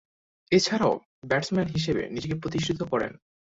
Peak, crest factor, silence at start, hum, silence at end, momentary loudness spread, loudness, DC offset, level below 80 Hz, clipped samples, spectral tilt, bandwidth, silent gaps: -8 dBFS; 20 dB; 0.5 s; none; 0.35 s; 8 LU; -27 LUFS; under 0.1%; -54 dBFS; under 0.1%; -5 dB/octave; 8 kHz; 1.06-1.22 s